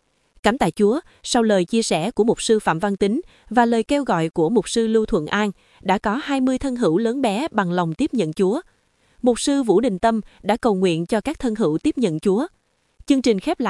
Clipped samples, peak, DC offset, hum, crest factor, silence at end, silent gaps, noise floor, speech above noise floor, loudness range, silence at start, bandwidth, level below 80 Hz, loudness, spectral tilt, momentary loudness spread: under 0.1%; 0 dBFS; under 0.1%; none; 20 dB; 0 s; none; -52 dBFS; 32 dB; 2 LU; 0.45 s; 12 kHz; -48 dBFS; -20 LUFS; -5 dB/octave; 5 LU